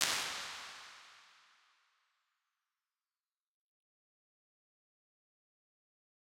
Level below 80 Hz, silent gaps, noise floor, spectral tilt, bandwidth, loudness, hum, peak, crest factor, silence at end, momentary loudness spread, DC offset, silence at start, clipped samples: -84 dBFS; none; under -90 dBFS; 1 dB/octave; 16.5 kHz; -39 LUFS; none; -6 dBFS; 42 dB; 5.05 s; 23 LU; under 0.1%; 0 s; under 0.1%